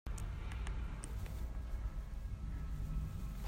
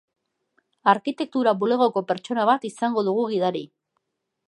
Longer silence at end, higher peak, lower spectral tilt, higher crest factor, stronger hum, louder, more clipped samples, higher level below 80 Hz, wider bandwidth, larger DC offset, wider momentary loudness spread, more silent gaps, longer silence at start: second, 0 s vs 0.8 s; second, -28 dBFS vs -4 dBFS; about the same, -6 dB/octave vs -6 dB/octave; second, 14 dB vs 20 dB; neither; second, -45 LUFS vs -23 LUFS; neither; first, -42 dBFS vs -78 dBFS; first, 16 kHz vs 11 kHz; neither; second, 3 LU vs 6 LU; neither; second, 0.05 s vs 0.85 s